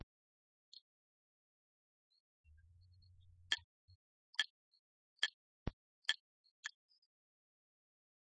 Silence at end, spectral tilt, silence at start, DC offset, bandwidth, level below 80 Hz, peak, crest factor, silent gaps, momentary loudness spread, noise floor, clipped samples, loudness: 1.55 s; 0.5 dB/octave; 3.5 s; under 0.1%; 5.4 kHz; -66 dBFS; -18 dBFS; 32 dB; 3.64-3.88 s, 3.95-4.33 s, 4.50-4.72 s, 4.79-5.16 s, 5.34-5.66 s, 5.73-6.02 s, 6.20-6.44 s, 6.51-6.63 s; 21 LU; -67 dBFS; under 0.1%; -43 LUFS